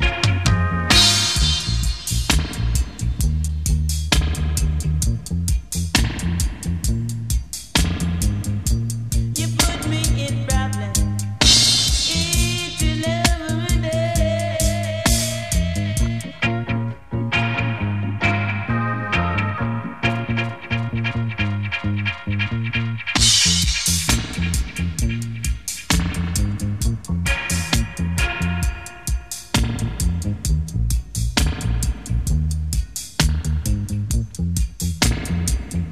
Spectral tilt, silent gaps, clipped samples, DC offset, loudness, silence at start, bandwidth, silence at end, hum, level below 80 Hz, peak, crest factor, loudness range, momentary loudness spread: -3.5 dB/octave; none; under 0.1%; 0.7%; -20 LUFS; 0 s; 15.5 kHz; 0 s; none; -26 dBFS; 0 dBFS; 20 dB; 6 LU; 8 LU